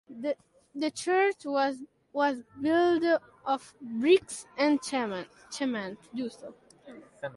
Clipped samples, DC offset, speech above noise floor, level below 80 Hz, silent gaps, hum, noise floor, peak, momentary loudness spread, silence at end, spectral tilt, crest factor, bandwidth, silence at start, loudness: under 0.1%; under 0.1%; 22 dB; -72 dBFS; none; none; -51 dBFS; -10 dBFS; 15 LU; 0 s; -4 dB/octave; 18 dB; 11.5 kHz; 0.1 s; -29 LUFS